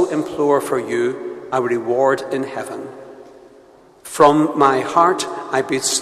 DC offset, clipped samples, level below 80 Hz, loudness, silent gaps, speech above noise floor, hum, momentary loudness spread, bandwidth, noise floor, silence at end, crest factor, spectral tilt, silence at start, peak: under 0.1%; under 0.1%; -58 dBFS; -18 LUFS; none; 30 dB; none; 16 LU; 14 kHz; -47 dBFS; 0 s; 18 dB; -4 dB/octave; 0 s; 0 dBFS